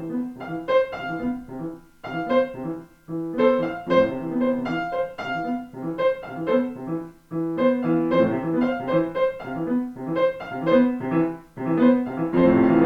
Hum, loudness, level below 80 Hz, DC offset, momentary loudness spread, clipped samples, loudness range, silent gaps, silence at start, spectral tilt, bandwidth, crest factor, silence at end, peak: none; -24 LUFS; -54 dBFS; under 0.1%; 12 LU; under 0.1%; 3 LU; none; 0 s; -8.5 dB/octave; 6.2 kHz; 16 dB; 0 s; -6 dBFS